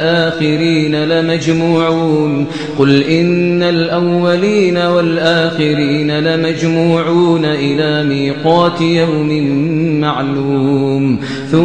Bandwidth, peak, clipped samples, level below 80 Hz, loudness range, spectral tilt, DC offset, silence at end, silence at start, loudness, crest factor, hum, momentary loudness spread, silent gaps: 9.2 kHz; 0 dBFS; under 0.1%; -50 dBFS; 1 LU; -6.5 dB/octave; 0.6%; 0 s; 0 s; -13 LUFS; 12 dB; none; 3 LU; none